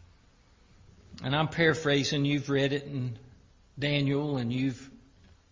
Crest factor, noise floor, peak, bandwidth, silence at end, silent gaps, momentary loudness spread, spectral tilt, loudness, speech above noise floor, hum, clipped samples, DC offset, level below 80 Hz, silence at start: 20 dB; -61 dBFS; -10 dBFS; 7.6 kHz; 0.55 s; none; 12 LU; -5.5 dB/octave; -29 LUFS; 32 dB; none; under 0.1%; under 0.1%; -58 dBFS; 1.1 s